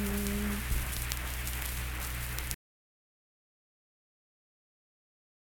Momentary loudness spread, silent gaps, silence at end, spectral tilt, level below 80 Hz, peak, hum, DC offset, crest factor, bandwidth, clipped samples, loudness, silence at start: 4 LU; none; 3.05 s; -4 dB/octave; -40 dBFS; -8 dBFS; none; under 0.1%; 30 dB; 19 kHz; under 0.1%; -35 LUFS; 0 s